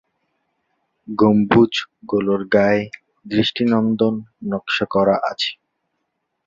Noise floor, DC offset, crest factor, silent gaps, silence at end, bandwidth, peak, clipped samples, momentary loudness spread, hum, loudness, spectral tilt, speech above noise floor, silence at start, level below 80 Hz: -74 dBFS; under 0.1%; 18 dB; none; 0.9 s; 7.6 kHz; -2 dBFS; under 0.1%; 11 LU; none; -18 LUFS; -6.5 dB/octave; 57 dB; 1.1 s; -54 dBFS